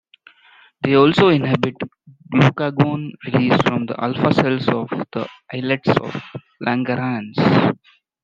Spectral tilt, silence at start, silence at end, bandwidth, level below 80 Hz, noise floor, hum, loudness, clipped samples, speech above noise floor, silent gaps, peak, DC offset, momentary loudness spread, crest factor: -7.5 dB/octave; 0.8 s; 0.5 s; 7.6 kHz; -54 dBFS; -51 dBFS; none; -18 LUFS; under 0.1%; 33 dB; none; 0 dBFS; under 0.1%; 14 LU; 18 dB